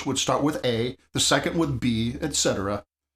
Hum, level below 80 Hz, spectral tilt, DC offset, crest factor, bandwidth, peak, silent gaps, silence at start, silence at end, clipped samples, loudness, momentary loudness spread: none; -48 dBFS; -3.5 dB/octave; under 0.1%; 20 dB; 15.5 kHz; -6 dBFS; none; 0 s; 0.35 s; under 0.1%; -24 LUFS; 8 LU